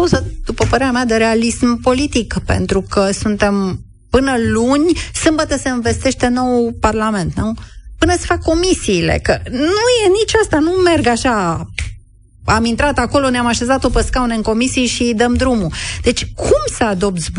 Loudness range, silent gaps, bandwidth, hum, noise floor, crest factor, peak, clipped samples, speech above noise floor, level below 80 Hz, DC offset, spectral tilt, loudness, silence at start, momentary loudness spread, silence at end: 2 LU; none; 11 kHz; none; -41 dBFS; 14 dB; 0 dBFS; under 0.1%; 27 dB; -28 dBFS; under 0.1%; -4.5 dB/octave; -15 LUFS; 0 s; 6 LU; 0 s